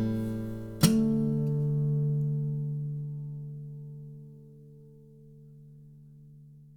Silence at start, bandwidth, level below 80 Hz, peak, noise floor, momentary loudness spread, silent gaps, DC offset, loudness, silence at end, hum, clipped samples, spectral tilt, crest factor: 0 s; 19.5 kHz; -56 dBFS; -8 dBFS; -52 dBFS; 25 LU; none; under 0.1%; -30 LUFS; 0.05 s; 50 Hz at -65 dBFS; under 0.1%; -6.5 dB/octave; 24 dB